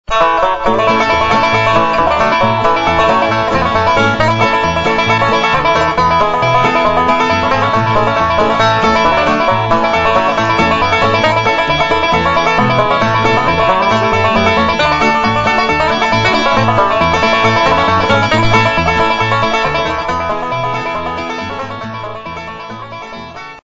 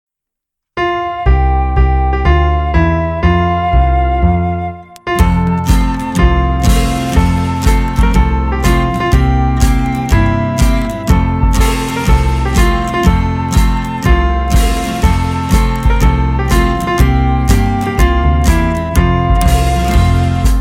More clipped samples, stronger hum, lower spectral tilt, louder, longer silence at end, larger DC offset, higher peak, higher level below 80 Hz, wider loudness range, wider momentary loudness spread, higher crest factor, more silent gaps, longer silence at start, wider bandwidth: neither; neither; about the same, -5 dB/octave vs -6 dB/octave; about the same, -11 LUFS vs -13 LUFS; about the same, 0.05 s vs 0 s; neither; about the same, 0 dBFS vs 0 dBFS; second, -32 dBFS vs -14 dBFS; about the same, 3 LU vs 1 LU; first, 8 LU vs 3 LU; about the same, 12 dB vs 10 dB; neither; second, 0.1 s vs 0.75 s; second, 7.8 kHz vs 16 kHz